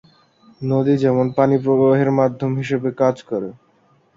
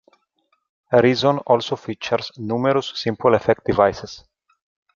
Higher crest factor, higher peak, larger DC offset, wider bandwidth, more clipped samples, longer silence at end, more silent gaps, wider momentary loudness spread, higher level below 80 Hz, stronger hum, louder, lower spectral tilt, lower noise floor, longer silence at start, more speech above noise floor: about the same, 16 dB vs 18 dB; about the same, -2 dBFS vs -2 dBFS; neither; about the same, 7.6 kHz vs 7.4 kHz; neither; about the same, 0.65 s vs 0.75 s; neither; about the same, 11 LU vs 10 LU; second, -60 dBFS vs -52 dBFS; neither; about the same, -18 LUFS vs -19 LUFS; first, -9 dB/octave vs -6 dB/octave; second, -57 dBFS vs -68 dBFS; second, 0.6 s vs 0.9 s; second, 40 dB vs 49 dB